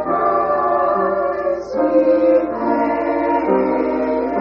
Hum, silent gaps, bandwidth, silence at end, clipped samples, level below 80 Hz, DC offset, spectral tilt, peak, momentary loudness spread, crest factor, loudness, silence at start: 60 Hz at -50 dBFS; none; 6.4 kHz; 0 s; under 0.1%; -48 dBFS; under 0.1%; -6 dB/octave; -4 dBFS; 5 LU; 14 dB; -17 LUFS; 0 s